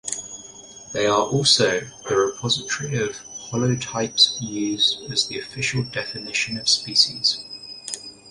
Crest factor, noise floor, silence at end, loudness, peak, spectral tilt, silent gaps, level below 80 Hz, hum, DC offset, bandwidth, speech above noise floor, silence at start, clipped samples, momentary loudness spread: 20 dB; -42 dBFS; 0 s; -21 LUFS; -2 dBFS; -3 dB/octave; none; -56 dBFS; none; under 0.1%; 11.5 kHz; 20 dB; 0.05 s; under 0.1%; 16 LU